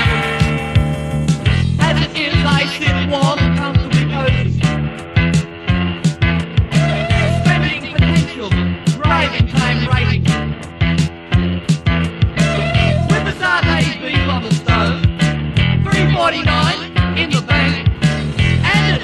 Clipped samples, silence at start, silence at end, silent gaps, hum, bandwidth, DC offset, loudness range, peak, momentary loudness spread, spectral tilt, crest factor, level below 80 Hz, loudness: under 0.1%; 0 s; 0 s; none; none; 11.5 kHz; under 0.1%; 1 LU; 0 dBFS; 4 LU; -6 dB/octave; 14 dB; -26 dBFS; -15 LUFS